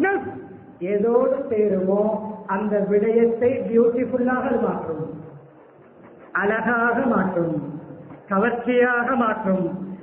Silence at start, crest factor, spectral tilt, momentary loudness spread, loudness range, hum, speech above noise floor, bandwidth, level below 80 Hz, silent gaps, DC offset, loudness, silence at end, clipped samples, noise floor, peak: 0 s; 14 dB; -12 dB/octave; 14 LU; 3 LU; none; 28 dB; 3.6 kHz; -58 dBFS; none; under 0.1%; -21 LUFS; 0 s; under 0.1%; -48 dBFS; -6 dBFS